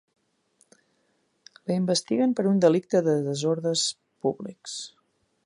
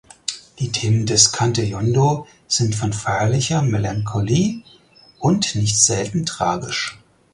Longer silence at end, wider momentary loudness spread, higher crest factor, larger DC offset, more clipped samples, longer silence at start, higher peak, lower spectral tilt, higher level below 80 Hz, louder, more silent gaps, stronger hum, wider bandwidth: first, 0.55 s vs 0.4 s; first, 15 LU vs 11 LU; about the same, 20 dB vs 20 dB; neither; neither; first, 1.65 s vs 0.3 s; second, -6 dBFS vs 0 dBFS; about the same, -5 dB/octave vs -4 dB/octave; second, -74 dBFS vs -46 dBFS; second, -25 LUFS vs -19 LUFS; neither; neither; about the same, 11.5 kHz vs 11.5 kHz